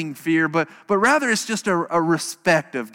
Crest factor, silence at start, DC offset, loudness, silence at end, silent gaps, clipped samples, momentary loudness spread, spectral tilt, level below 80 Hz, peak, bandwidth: 16 dB; 0 s; under 0.1%; -20 LUFS; 0.05 s; none; under 0.1%; 5 LU; -4 dB/octave; -66 dBFS; -6 dBFS; 17 kHz